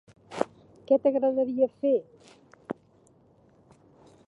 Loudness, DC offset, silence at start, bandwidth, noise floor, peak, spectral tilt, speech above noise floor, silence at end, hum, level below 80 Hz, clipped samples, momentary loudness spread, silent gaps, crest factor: -27 LUFS; under 0.1%; 0.3 s; 10.5 kHz; -61 dBFS; -6 dBFS; -7 dB/octave; 36 dB; 1.55 s; none; -74 dBFS; under 0.1%; 17 LU; none; 24 dB